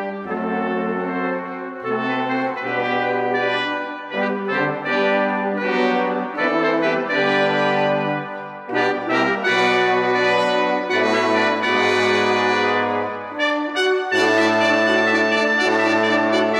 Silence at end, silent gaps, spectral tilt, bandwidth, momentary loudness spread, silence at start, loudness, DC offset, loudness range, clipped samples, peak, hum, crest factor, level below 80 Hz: 0 s; none; -4.5 dB/octave; 11.5 kHz; 8 LU; 0 s; -19 LUFS; under 0.1%; 5 LU; under 0.1%; -6 dBFS; none; 14 dB; -70 dBFS